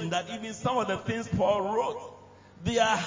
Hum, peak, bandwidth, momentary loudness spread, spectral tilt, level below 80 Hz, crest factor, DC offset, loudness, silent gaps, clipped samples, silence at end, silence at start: none; -10 dBFS; 7.6 kHz; 11 LU; -4.5 dB/octave; -52 dBFS; 18 dB; under 0.1%; -29 LUFS; none; under 0.1%; 0 s; 0 s